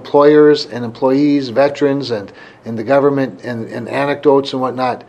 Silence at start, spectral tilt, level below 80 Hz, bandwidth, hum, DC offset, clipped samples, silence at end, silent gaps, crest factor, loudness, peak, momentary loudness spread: 0 s; -7 dB/octave; -62 dBFS; 8.8 kHz; none; under 0.1%; under 0.1%; 0.05 s; none; 14 dB; -14 LUFS; 0 dBFS; 14 LU